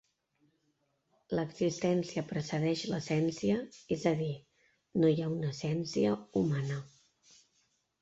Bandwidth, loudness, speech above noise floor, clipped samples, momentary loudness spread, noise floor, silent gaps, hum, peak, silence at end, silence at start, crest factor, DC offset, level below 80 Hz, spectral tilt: 8 kHz; -33 LUFS; 45 dB; under 0.1%; 8 LU; -77 dBFS; none; none; -16 dBFS; 1.15 s; 1.3 s; 18 dB; under 0.1%; -68 dBFS; -6.5 dB/octave